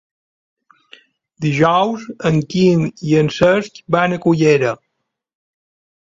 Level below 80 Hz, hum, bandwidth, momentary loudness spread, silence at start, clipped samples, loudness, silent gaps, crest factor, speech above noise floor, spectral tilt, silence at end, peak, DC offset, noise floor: -52 dBFS; none; 7.8 kHz; 7 LU; 1.4 s; under 0.1%; -16 LUFS; none; 16 dB; 60 dB; -6.5 dB/octave; 1.3 s; 0 dBFS; under 0.1%; -75 dBFS